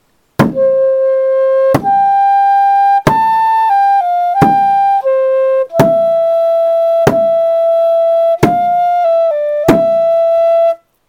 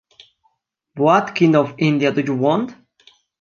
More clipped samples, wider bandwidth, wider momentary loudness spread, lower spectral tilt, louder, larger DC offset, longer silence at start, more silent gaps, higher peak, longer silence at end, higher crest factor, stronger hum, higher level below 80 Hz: first, 0.4% vs under 0.1%; first, 18 kHz vs 7.2 kHz; about the same, 3 LU vs 5 LU; about the same, -7 dB/octave vs -7 dB/octave; first, -11 LUFS vs -17 LUFS; neither; second, 0.4 s vs 0.95 s; neither; about the same, 0 dBFS vs -2 dBFS; second, 0.35 s vs 0.7 s; second, 10 dB vs 18 dB; neither; first, -44 dBFS vs -66 dBFS